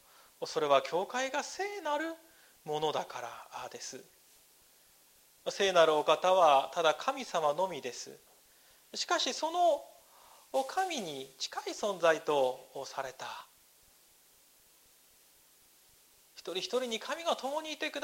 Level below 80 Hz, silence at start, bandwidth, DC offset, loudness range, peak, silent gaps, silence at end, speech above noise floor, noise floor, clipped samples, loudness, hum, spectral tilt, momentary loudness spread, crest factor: -80 dBFS; 0.4 s; 16 kHz; under 0.1%; 12 LU; -12 dBFS; none; 0 s; 32 dB; -64 dBFS; under 0.1%; -32 LUFS; none; -2.5 dB/octave; 18 LU; 22 dB